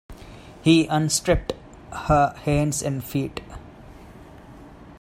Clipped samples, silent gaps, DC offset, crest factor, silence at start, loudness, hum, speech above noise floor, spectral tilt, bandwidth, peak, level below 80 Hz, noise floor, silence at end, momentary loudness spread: under 0.1%; none; under 0.1%; 20 dB; 0.1 s; -22 LUFS; none; 23 dB; -5 dB/octave; 16 kHz; -4 dBFS; -40 dBFS; -44 dBFS; 0.1 s; 24 LU